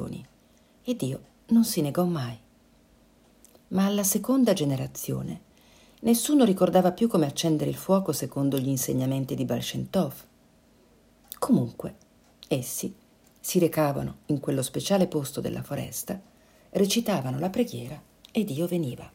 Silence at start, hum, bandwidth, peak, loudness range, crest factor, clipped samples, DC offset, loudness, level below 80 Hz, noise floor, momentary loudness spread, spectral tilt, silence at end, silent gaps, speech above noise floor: 0 s; none; 16.5 kHz; -8 dBFS; 6 LU; 20 dB; under 0.1%; under 0.1%; -26 LUFS; -60 dBFS; -59 dBFS; 15 LU; -5.5 dB/octave; 0.05 s; none; 34 dB